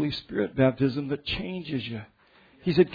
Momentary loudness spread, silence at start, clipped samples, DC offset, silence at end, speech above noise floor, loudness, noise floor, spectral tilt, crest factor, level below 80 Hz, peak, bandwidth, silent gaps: 10 LU; 0 s; under 0.1%; under 0.1%; 0 s; 31 dB; -28 LUFS; -57 dBFS; -8.5 dB/octave; 20 dB; -52 dBFS; -8 dBFS; 5 kHz; none